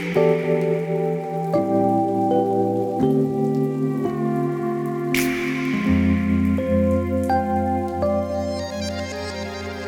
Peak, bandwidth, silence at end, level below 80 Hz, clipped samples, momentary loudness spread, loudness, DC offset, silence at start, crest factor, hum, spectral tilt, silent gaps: -6 dBFS; over 20 kHz; 0 s; -42 dBFS; under 0.1%; 7 LU; -22 LUFS; under 0.1%; 0 s; 16 dB; none; -7 dB/octave; none